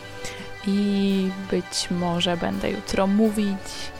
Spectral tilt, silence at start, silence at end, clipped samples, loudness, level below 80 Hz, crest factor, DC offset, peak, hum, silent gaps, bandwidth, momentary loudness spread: -5 dB/octave; 0 s; 0 s; under 0.1%; -24 LUFS; -46 dBFS; 18 dB; 0.4%; -6 dBFS; none; none; 16 kHz; 10 LU